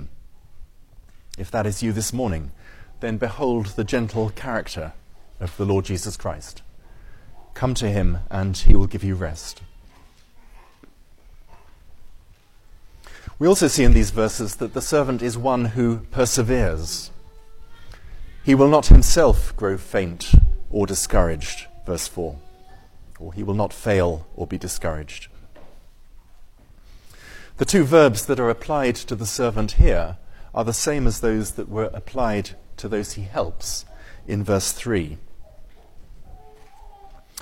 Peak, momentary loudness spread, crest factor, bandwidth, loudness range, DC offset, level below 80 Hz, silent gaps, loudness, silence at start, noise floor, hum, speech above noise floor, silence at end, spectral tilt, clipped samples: 0 dBFS; 18 LU; 20 dB; 16.5 kHz; 9 LU; under 0.1%; -24 dBFS; none; -22 LUFS; 0 s; -49 dBFS; none; 31 dB; 0.25 s; -5.5 dB/octave; under 0.1%